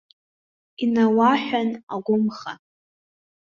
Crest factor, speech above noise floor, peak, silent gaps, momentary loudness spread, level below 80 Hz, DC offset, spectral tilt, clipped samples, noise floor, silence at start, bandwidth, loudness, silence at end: 18 dB; over 69 dB; -6 dBFS; 1.83-1.87 s; 18 LU; -68 dBFS; under 0.1%; -6.5 dB/octave; under 0.1%; under -90 dBFS; 0.8 s; 7 kHz; -21 LUFS; 0.9 s